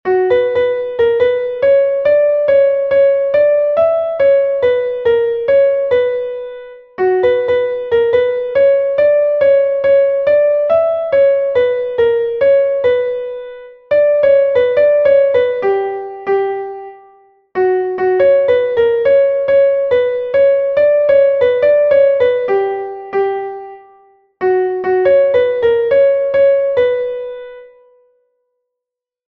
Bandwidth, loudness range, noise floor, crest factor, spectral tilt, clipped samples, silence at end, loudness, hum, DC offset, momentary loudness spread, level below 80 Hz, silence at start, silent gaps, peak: 4.5 kHz; 4 LU; -83 dBFS; 12 dB; -7 dB/octave; under 0.1%; 1.6 s; -13 LUFS; none; under 0.1%; 9 LU; -52 dBFS; 0.05 s; none; -2 dBFS